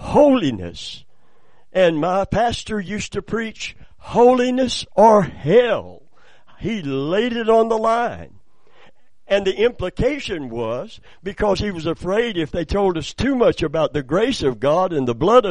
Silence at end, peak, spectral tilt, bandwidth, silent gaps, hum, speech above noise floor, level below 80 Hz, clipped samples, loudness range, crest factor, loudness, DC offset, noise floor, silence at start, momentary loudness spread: 0 s; 0 dBFS; -5.5 dB/octave; 10.5 kHz; none; none; 41 dB; -40 dBFS; under 0.1%; 5 LU; 18 dB; -19 LUFS; 0.9%; -59 dBFS; 0 s; 13 LU